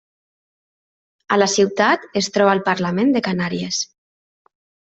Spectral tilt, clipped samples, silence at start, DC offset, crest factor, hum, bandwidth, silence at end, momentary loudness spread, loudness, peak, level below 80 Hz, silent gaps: -4 dB/octave; under 0.1%; 1.3 s; under 0.1%; 18 dB; none; 8.2 kHz; 1.1 s; 7 LU; -18 LUFS; -2 dBFS; -62 dBFS; none